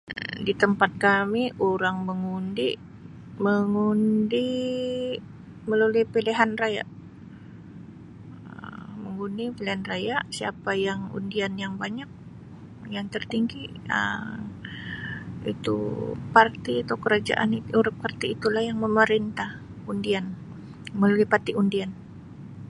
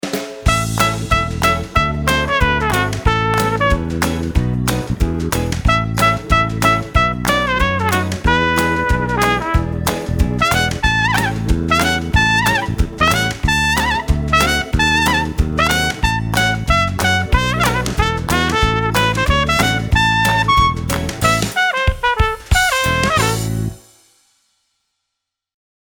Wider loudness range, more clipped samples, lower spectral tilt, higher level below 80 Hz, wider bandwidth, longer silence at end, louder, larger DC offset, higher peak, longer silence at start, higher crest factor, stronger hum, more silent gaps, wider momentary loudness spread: first, 7 LU vs 2 LU; neither; first, -6 dB/octave vs -4.5 dB/octave; second, -56 dBFS vs -24 dBFS; second, 11.5 kHz vs over 20 kHz; second, 0 s vs 2.2 s; second, -26 LUFS vs -16 LUFS; neither; about the same, -2 dBFS vs 0 dBFS; about the same, 0.05 s vs 0.05 s; first, 24 dB vs 16 dB; neither; neither; first, 22 LU vs 5 LU